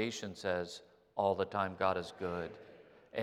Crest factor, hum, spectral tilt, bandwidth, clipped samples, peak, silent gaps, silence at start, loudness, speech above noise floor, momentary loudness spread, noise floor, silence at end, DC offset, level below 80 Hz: 20 dB; none; -5 dB/octave; 14 kHz; under 0.1%; -18 dBFS; none; 0 s; -37 LUFS; 20 dB; 14 LU; -57 dBFS; 0 s; under 0.1%; -74 dBFS